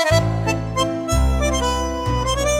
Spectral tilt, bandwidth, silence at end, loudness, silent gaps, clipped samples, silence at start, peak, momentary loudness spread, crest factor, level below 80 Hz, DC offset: -4.5 dB/octave; 16 kHz; 0 s; -20 LUFS; none; under 0.1%; 0 s; -4 dBFS; 4 LU; 16 dB; -24 dBFS; under 0.1%